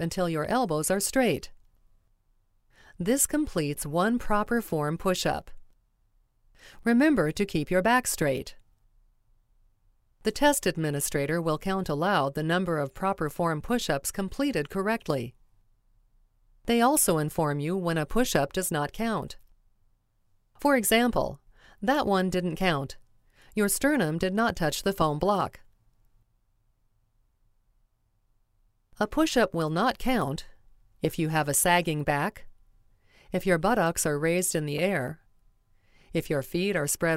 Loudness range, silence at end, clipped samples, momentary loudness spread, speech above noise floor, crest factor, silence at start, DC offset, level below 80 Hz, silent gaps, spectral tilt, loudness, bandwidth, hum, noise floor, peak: 3 LU; 0 s; under 0.1%; 9 LU; 43 dB; 22 dB; 0 s; under 0.1%; -48 dBFS; none; -4.5 dB/octave; -27 LUFS; 16 kHz; none; -70 dBFS; -6 dBFS